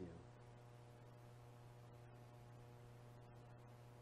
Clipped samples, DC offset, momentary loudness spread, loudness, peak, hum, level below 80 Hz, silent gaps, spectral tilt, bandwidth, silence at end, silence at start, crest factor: under 0.1%; under 0.1%; 1 LU; -62 LUFS; -42 dBFS; none; -74 dBFS; none; -7 dB/octave; 14 kHz; 0 s; 0 s; 18 dB